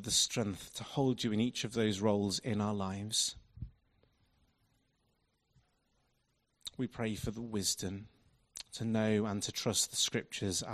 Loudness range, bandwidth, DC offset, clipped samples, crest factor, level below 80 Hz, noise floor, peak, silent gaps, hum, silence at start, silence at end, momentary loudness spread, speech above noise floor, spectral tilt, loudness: 11 LU; 14 kHz; under 0.1%; under 0.1%; 20 dB; -62 dBFS; -78 dBFS; -16 dBFS; none; none; 0 s; 0 s; 16 LU; 43 dB; -3.5 dB/octave; -34 LUFS